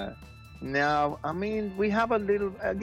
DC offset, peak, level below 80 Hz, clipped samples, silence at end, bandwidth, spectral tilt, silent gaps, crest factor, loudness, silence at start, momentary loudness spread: under 0.1%; -12 dBFS; -52 dBFS; under 0.1%; 0 s; 12 kHz; -6.5 dB/octave; none; 16 dB; -28 LUFS; 0 s; 15 LU